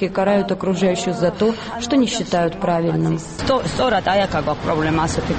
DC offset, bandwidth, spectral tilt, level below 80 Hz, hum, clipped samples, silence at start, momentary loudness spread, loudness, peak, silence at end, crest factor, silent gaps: under 0.1%; 8.8 kHz; -5.5 dB/octave; -40 dBFS; none; under 0.1%; 0 s; 3 LU; -19 LUFS; -4 dBFS; 0 s; 14 dB; none